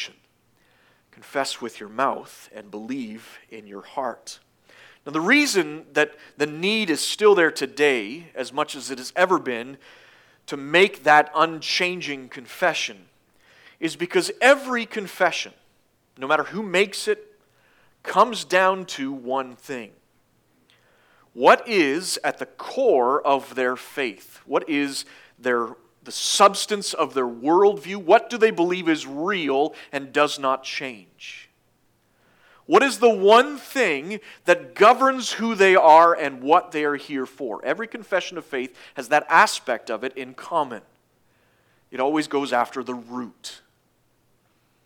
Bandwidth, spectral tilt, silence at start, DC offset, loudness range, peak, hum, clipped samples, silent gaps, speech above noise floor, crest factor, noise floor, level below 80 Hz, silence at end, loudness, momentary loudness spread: 18.5 kHz; -3 dB/octave; 0 s; under 0.1%; 9 LU; -2 dBFS; none; under 0.1%; none; 44 dB; 22 dB; -65 dBFS; -78 dBFS; 1.3 s; -21 LUFS; 18 LU